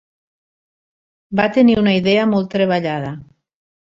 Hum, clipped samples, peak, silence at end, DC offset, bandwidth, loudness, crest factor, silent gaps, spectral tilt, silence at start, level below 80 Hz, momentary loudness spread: none; under 0.1%; -2 dBFS; 0.75 s; under 0.1%; 7.4 kHz; -16 LUFS; 18 dB; none; -7.5 dB/octave; 1.3 s; -52 dBFS; 12 LU